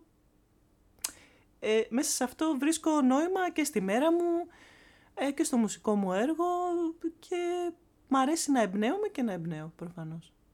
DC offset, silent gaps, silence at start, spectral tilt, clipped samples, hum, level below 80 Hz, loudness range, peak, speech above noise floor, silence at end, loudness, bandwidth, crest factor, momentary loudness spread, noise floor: under 0.1%; none; 1.05 s; -4.5 dB/octave; under 0.1%; none; -68 dBFS; 3 LU; -14 dBFS; 37 dB; 0.3 s; -30 LUFS; 17.5 kHz; 18 dB; 13 LU; -67 dBFS